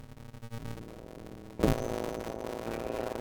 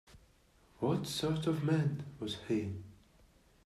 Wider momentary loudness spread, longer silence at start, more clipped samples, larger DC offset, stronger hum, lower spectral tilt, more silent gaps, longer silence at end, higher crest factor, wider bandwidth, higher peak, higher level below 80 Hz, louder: first, 17 LU vs 10 LU; about the same, 0 s vs 0.1 s; neither; neither; neither; about the same, -6 dB/octave vs -6.5 dB/octave; neither; second, 0 s vs 0.7 s; first, 26 dB vs 18 dB; first, 19.5 kHz vs 14 kHz; first, -10 dBFS vs -18 dBFS; first, -46 dBFS vs -64 dBFS; about the same, -36 LUFS vs -36 LUFS